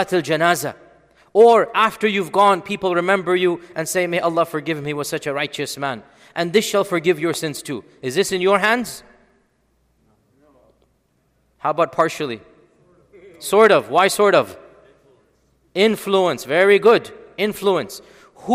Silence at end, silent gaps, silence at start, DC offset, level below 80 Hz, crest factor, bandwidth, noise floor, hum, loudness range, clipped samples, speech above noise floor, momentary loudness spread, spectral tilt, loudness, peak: 0 s; none; 0 s; under 0.1%; -62 dBFS; 18 dB; 16 kHz; -64 dBFS; none; 9 LU; under 0.1%; 46 dB; 15 LU; -4 dB/octave; -18 LUFS; 0 dBFS